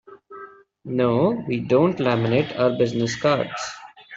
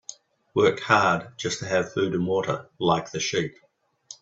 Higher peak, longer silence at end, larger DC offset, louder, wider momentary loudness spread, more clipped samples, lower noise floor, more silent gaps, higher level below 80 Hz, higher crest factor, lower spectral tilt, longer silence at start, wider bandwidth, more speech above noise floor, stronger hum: about the same, -4 dBFS vs -2 dBFS; about the same, 0 s vs 0.05 s; neither; first, -21 LUFS vs -24 LUFS; first, 21 LU vs 10 LU; neither; second, -43 dBFS vs -49 dBFS; neither; about the same, -58 dBFS vs -62 dBFS; second, 18 dB vs 24 dB; first, -6 dB/octave vs -4.5 dB/octave; about the same, 0.1 s vs 0.1 s; about the same, 8 kHz vs 8 kHz; about the same, 23 dB vs 25 dB; neither